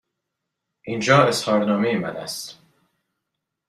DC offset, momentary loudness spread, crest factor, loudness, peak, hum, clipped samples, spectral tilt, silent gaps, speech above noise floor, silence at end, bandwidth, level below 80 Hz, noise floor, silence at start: under 0.1%; 17 LU; 22 dB; -20 LUFS; -2 dBFS; none; under 0.1%; -5 dB/octave; none; 61 dB; 1.15 s; 14.5 kHz; -62 dBFS; -81 dBFS; 0.85 s